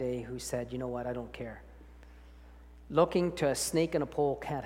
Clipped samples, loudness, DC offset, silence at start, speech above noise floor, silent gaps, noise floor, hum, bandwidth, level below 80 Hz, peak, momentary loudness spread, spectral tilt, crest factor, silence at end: under 0.1%; -32 LUFS; under 0.1%; 0 s; 21 dB; none; -53 dBFS; 60 Hz at -55 dBFS; 17 kHz; -54 dBFS; -12 dBFS; 13 LU; -5 dB/octave; 20 dB; 0 s